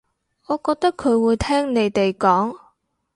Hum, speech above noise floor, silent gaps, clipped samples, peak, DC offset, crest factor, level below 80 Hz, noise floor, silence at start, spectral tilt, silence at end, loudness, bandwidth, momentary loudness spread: none; 43 dB; none; under 0.1%; -4 dBFS; under 0.1%; 16 dB; -44 dBFS; -62 dBFS; 0.5 s; -6 dB/octave; 0.6 s; -20 LUFS; 11.5 kHz; 6 LU